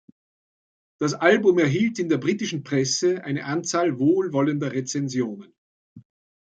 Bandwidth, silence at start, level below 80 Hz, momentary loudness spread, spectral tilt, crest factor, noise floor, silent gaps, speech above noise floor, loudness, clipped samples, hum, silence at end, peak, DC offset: 9 kHz; 1 s; -68 dBFS; 9 LU; -5 dB/octave; 20 dB; under -90 dBFS; 5.58-5.96 s; over 68 dB; -23 LUFS; under 0.1%; none; 0.4 s; -2 dBFS; under 0.1%